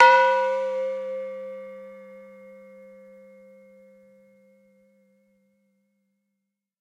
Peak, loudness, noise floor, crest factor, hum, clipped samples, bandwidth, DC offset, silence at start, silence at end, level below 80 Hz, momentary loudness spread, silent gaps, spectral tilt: -2 dBFS; -23 LUFS; -82 dBFS; 26 dB; none; under 0.1%; 9.6 kHz; under 0.1%; 0 s; 4.6 s; -84 dBFS; 28 LU; none; -2.5 dB/octave